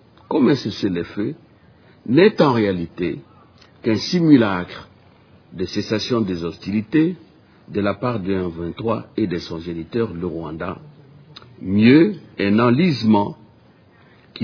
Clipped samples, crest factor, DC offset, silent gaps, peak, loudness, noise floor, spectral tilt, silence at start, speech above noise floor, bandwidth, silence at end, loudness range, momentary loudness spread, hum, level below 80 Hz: under 0.1%; 20 dB; under 0.1%; none; 0 dBFS; -19 LUFS; -51 dBFS; -7 dB/octave; 0.3 s; 32 dB; 5.4 kHz; 0 s; 6 LU; 15 LU; none; -52 dBFS